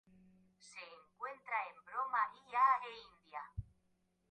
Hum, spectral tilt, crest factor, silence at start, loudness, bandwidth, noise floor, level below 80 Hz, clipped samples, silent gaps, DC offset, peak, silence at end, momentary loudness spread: none; -4 dB/octave; 20 dB; 0.65 s; -38 LUFS; 9 kHz; -79 dBFS; -64 dBFS; under 0.1%; none; under 0.1%; -20 dBFS; 0.7 s; 21 LU